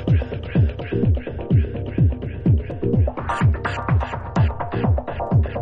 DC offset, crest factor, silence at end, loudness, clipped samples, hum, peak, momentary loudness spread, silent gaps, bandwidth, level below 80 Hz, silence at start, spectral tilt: under 0.1%; 14 dB; 0 s; -21 LUFS; under 0.1%; none; -6 dBFS; 3 LU; none; 7.8 kHz; -28 dBFS; 0 s; -9 dB/octave